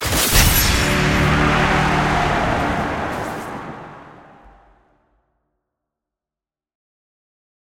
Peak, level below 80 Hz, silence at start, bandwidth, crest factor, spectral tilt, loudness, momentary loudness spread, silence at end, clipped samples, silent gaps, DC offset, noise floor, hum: 0 dBFS; -28 dBFS; 0 s; 17 kHz; 20 dB; -3.5 dB/octave; -17 LUFS; 17 LU; 3.65 s; under 0.1%; none; under 0.1%; -90 dBFS; none